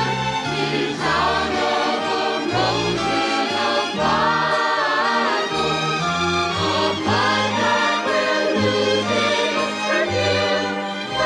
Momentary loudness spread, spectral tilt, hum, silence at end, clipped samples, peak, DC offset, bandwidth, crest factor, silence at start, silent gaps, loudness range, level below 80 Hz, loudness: 3 LU; -4 dB/octave; none; 0 s; under 0.1%; -8 dBFS; under 0.1%; 13 kHz; 12 dB; 0 s; none; 1 LU; -50 dBFS; -19 LUFS